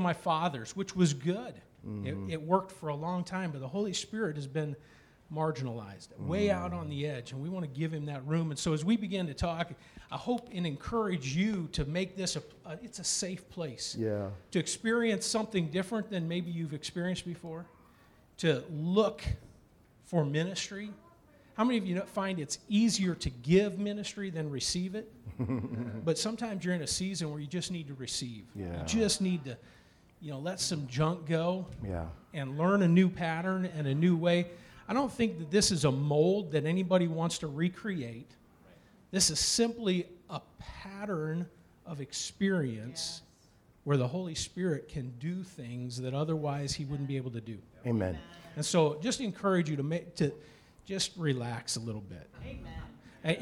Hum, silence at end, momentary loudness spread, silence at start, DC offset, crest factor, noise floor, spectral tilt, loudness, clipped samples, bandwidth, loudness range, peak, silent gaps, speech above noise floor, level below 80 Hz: none; 0 s; 15 LU; 0 s; under 0.1%; 20 dB; -63 dBFS; -5 dB/octave; -33 LUFS; under 0.1%; 14 kHz; 6 LU; -12 dBFS; none; 30 dB; -56 dBFS